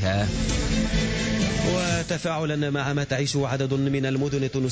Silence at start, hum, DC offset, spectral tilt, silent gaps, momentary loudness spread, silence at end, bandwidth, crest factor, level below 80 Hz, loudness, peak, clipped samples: 0 s; none; under 0.1%; -5 dB/octave; none; 2 LU; 0 s; 8 kHz; 12 dB; -34 dBFS; -25 LUFS; -12 dBFS; under 0.1%